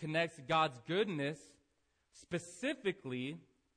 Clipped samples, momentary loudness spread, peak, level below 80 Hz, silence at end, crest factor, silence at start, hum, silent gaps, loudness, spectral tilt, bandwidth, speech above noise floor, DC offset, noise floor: under 0.1%; 10 LU; -20 dBFS; -74 dBFS; 0.35 s; 18 dB; 0 s; none; none; -38 LUFS; -5 dB/octave; 10.5 kHz; 41 dB; under 0.1%; -79 dBFS